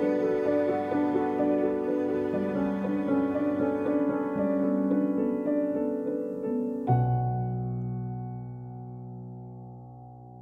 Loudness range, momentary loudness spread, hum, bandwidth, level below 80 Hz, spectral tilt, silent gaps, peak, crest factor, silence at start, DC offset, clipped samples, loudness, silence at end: 4 LU; 15 LU; none; 5 kHz; -58 dBFS; -10.5 dB/octave; none; -12 dBFS; 16 dB; 0 s; under 0.1%; under 0.1%; -28 LUFS; 0 s